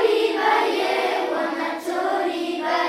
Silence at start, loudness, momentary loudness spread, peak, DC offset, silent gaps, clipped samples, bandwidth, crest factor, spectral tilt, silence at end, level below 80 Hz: 0 s; -22 LUFS; 6 LU; -6 dBFS; under 0.1%; none; under 0.1%; 16 kHz; 16 dB; -2.5 dB/octave; 0 s; -74 dBFS